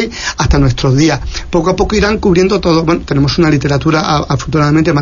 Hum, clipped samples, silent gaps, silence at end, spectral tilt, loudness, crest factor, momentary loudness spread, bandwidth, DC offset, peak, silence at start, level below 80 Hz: none; under 0.1%; none; 0 s; -6 dB/octave; -12 LUFS; 10 dB; 4 LU; 7.4 kHz; under 0.1%; 0 dBFS; 0 s; -22 dBFS